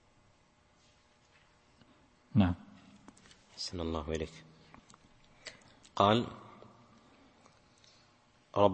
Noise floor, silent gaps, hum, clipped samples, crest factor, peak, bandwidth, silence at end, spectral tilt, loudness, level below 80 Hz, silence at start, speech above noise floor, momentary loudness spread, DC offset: -68 dBFS; none; none; under 0.1%; 26 dB; -10 dBFS; 8.4 kHz; 0 s; -6.5 dB/octave; -33 LUFS; -58 dBFS; 2.35 s; 35 dB; 29 LU; under 0.1%